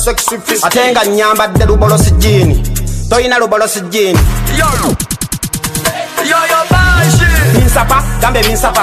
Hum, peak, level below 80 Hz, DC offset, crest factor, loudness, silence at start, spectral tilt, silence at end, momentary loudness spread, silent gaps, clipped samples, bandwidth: none; 0 dBFS; -16 dBFS; under 0.1%; 10 dB; -10 LUFS; 0 s; -4.5 dB/octave; 0 s; 7 LU; none; under 0.1%; 15 kHz